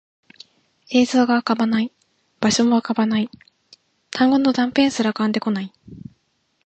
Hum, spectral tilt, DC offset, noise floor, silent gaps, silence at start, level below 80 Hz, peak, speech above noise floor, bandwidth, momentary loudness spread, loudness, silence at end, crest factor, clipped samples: none; -4.5 dB/octave; under 0.1%; -68 dBFS; none; 0.9 s; -60 dBFS; -4 dBFS; 49 dB; 8.8 kHz; 14 LU; -19 LUFS; 0.7 s; 18 dB; under 0.1%